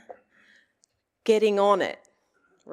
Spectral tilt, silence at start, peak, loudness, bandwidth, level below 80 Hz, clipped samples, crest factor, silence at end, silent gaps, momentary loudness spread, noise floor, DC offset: -4.5 dB/octave; 0.1 s; -8 dBFS; -23 LUFS; 12 kHz; -82 dBFS; under 0.1%; 20 dB; 0 s; none; 12 LU; -71 dBFS; under 0.1%